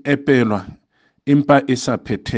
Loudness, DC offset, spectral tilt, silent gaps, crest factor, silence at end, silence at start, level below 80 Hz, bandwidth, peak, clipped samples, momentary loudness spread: -17 LUFS; under 0.1%; -6.5 dB/octave; none; 18 dB; 0 s; 0.05 s; -48 dBFS; 9.4 kHz; 0 dBFS; under 0.1%; 10 LU